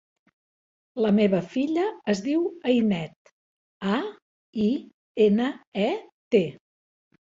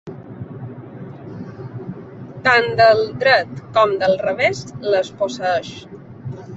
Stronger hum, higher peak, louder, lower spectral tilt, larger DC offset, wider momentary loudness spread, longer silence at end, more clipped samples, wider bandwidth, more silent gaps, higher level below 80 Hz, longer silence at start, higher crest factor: neither; second, -8 dBFS vs -2 dBFS; second, -25 LUFS vs -17 LUFS; first, -7 dB/octave vs -5 dB/octave; neither; second, 12 LU vs 21 LU; first, 0.75 s vs 0 s; neither; about the same, 7.6 kHz vs 8 kHz; first, 3.16-3.25 s, 3.32-3.80 s, 4.22-4.53 s, 4.94-5.15 s, 5.67-5.72 s, 6.12-6.31 s vs none; second, -66 dBFS vs -54 dBFS; first, 0.95 s vs 0.05 s; about the same, 18 dB vs 18 dB